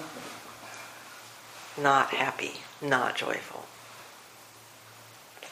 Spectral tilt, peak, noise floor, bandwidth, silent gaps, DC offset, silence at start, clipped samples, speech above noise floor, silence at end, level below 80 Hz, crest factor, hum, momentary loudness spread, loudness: -3 dB/octave; -8 dBFS; -52 dBFS; 15.5 kHz; none; under 0.1%; 0 s; under 0.1%; 23 dB; 0 s; -76 dBFS; 26 dB; none; 25 LU; -28 LUFS